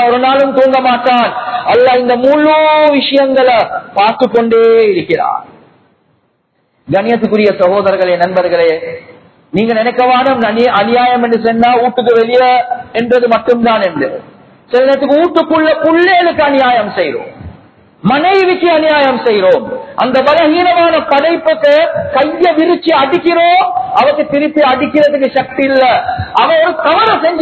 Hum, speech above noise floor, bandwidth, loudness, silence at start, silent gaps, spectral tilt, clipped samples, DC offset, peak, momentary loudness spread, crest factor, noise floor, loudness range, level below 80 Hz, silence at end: none; 50 dB; 8 kHz; -10 LUFS; 0 s; none; -7 dB/octave; 0.3%; under 0.1%; 0 dBFS; 6 LU; 10 dB; -59 dBFS; 3 LU; -46 dBFS; 0 s